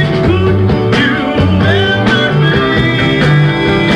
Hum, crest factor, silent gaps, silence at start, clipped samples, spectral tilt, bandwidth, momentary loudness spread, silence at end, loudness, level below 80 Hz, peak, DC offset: none; 10 dB; none; 0 s; under 0.1%; -7 dB/octave; 9.8 kHz; 2 LU; 0 s; -10 LUFS; -28 dBFS; 0 dBFS; under 0.1%